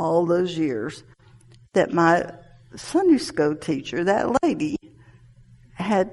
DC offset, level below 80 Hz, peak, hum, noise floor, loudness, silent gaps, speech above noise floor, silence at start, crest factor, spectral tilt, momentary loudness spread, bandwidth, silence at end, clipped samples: under 0.1%; -56 dBFS; -6 dBFS; none; -51 dBFS; -22 LUFS; none; 30 dB; 0 s; 18 dB; -6 dB/octave; 14 LU; 11.5 kHz; 0 s; under 0.1%